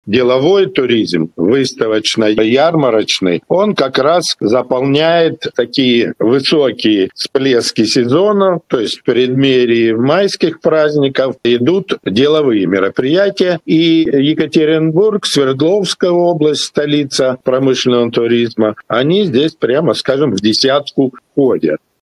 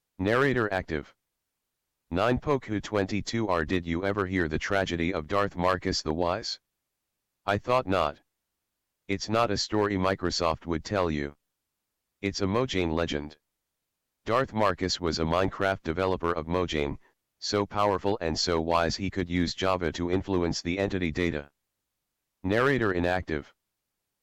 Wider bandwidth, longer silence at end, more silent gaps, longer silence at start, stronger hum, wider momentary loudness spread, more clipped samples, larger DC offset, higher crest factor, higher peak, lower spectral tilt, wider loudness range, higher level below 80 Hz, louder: second, 12.5 kHz vs 15 kHz; second, 0.25 s vs 0.8 s; neither; second, 0.05 s vs 0.2 s; neither; second, 4 LU vs 8 LU; neither; neither; about the same, 12 dB vs 14 dB; first, 0 dBFS vs -14 dBFS; about the same, -5 dB/octave vs -5 dB/octave; about the same, 1 LU vs 2 LU; second, -56 dBFS vs -48 dBFS; first, -12 LUFS vs -28 LUFS